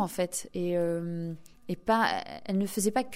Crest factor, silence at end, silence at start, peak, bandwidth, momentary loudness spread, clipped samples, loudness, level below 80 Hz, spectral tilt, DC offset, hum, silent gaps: 18 dB; 0 s; 0 s; -12 dBFS; 16 kHz; 11 LU; under 0.1%; -30 LUFS; -60 dBFS; -4.5 dB/octave; under 0.1%; none; none